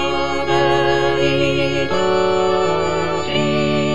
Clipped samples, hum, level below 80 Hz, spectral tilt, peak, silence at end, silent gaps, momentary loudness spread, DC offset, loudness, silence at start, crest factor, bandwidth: under 0.1%; none; -40 dBFS; -5.5 dB/octave; -4 dBFS; 0 s; none; 3 LU; 4%; -17 LUFS; 0 s; 14 dB; 10.5 kHz